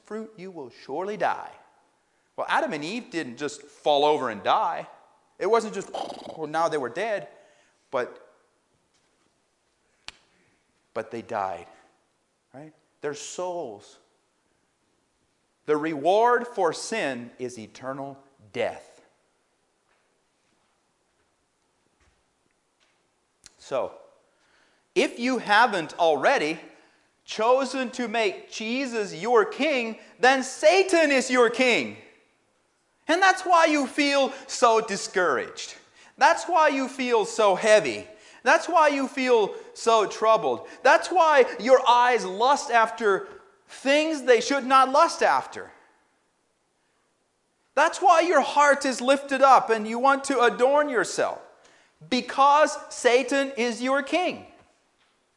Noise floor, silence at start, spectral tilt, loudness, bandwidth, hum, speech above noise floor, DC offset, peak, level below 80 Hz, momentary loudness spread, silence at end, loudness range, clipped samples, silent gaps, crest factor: -71 dBFS; 0.1 s; -3 dB/octave; -23 LUFS; 11.5 kHz; none; 48 dB; under 0.1%; -4 dBFS; -74 dBFS; 16 LU; 0.9 s; 17 LU; under 0.1%; none; 20 dB